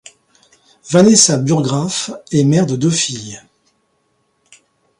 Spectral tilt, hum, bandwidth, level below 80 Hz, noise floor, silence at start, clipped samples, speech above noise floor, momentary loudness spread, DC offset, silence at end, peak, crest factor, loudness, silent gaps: -4.5 dB/octave; none; 11.5 kHz; -56 dBFS; -63 dBFS; 0.85 s; under 0.1%; 50 dB; 15 LU; under 0.1%; 1.6 s; 0 dBFS; 16 dB; -13 LUFS; none